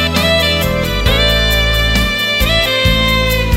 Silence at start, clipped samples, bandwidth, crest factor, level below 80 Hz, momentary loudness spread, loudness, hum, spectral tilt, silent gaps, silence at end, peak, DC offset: 0 s; under 0.1%; 16.5 kHz; 12 dB; -18 dBFS; 2 LU; -12 LUFS; none; -4 dB/octave; none; 0 s; 0 dBFS; under 0.1%